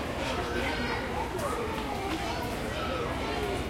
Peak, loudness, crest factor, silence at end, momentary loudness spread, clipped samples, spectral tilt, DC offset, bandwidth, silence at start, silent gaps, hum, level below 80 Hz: -18 dBFS; -32 LUFS; 14 dB; 0 s; 2 LU; under 0.1%; -5 dB/octave; under 0.1%; 16.5 kHz; 0 s; none; none; -42 dBFS